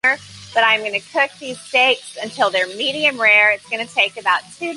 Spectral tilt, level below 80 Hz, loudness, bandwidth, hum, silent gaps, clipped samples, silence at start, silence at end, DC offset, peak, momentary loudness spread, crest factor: -1.5 dB/octave; -64 dBFS; -16 LUFS; 11.5 kHz; none; none; under 0.1%; 0.05 s; 0 s; under 0.1%; -2 dBFS; 10 LU; 16 dB